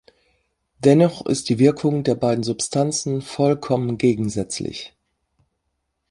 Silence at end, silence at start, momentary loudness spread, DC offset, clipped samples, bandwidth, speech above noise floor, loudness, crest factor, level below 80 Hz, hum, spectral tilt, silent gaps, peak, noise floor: 1.25 s; 0.8 s; 10 LU; under 0.1%; under 0.1%; 11.5 kHz; 55 dB; -20 LUFS; 18 dB; -56 dBFS; none; -6 dB/octave; none; -2 dBFS; -75 dBFS